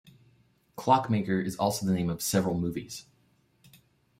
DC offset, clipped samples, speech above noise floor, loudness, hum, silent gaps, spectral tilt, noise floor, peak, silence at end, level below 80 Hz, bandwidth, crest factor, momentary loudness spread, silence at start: under 0.1%; under 0.1%; 40 dB; -28 LUFS; none; none; -5.5 dB/octave; -67 dBFS; -8 dBFS; 1.2 s; -62 dBFS; 16 kHz; 22 dB; 15 LU; 0.75 s